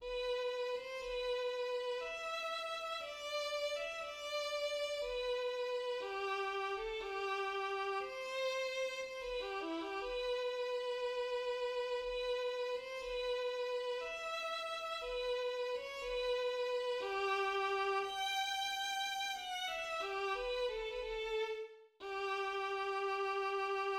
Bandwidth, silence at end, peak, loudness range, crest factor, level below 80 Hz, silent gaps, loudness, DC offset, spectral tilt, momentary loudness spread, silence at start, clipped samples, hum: 16 kHz; 0 s; -26 dBFS; 3 LU; 14 dB; -66 dBFS; none; -39 LUFS; under 0.1%; -1.5 dB/octave; 4 LU; 0 s; under 0.1%; none